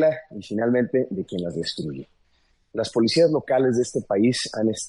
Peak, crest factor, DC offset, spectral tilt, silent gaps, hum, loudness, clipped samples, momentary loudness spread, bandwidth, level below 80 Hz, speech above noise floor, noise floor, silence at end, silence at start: -8 dBFS; 16 dB; under 0.1%; -5 dB/octave; none; none; -23 LUFS; under 0.1%; 12 LU; 11.5 kHz; -62 dBFS; 42 dB; -64 dBFS; 0 s; 0 s